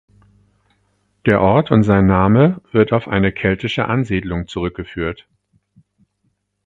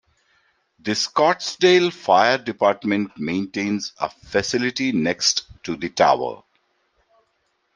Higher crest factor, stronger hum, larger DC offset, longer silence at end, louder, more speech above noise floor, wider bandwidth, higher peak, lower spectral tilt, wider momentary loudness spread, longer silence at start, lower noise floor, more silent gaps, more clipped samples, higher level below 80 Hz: about the same, 18 dB vs 20 dB; neither; neither; about the same, 1.5 s vs 1.4 s; first, -16 LUFS vs -20 LUFS; about the same, 52 dB vs 49 dB; second, 7.6 kHz vs 10 kHz; about the same, 0 dBFS vs -2 dBFS; first, -8.5 dB/octave vs -3.5 dB/octave; about the same, 12 LU vs 12 LU; first, 1.25 s vs 0.85 s; about the same, -68 dBFS vs -69 dBFS; neither; neither; first, -38 dBFS vs -60 dBFS